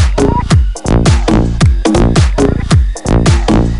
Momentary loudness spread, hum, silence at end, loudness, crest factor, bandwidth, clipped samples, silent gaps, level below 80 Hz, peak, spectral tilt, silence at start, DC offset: 3 LU; none; 0 s; -11 LUFS; 8 dB; 11.5 kHz; under 0.1%; none; -14 dBFS; 0 dBFS; -6.5 dB/octave; 0 s; under 0.1%